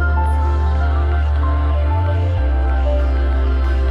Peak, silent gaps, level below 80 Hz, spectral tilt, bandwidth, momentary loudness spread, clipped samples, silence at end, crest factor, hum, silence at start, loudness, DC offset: -6 dBFS; none; -16 dBFS; -8.5 dB/octave; 5 kHz; 1 LU; under 0.1%; 0 s; 8 dB; none; 0 s; -18 LUFS; under 0.1%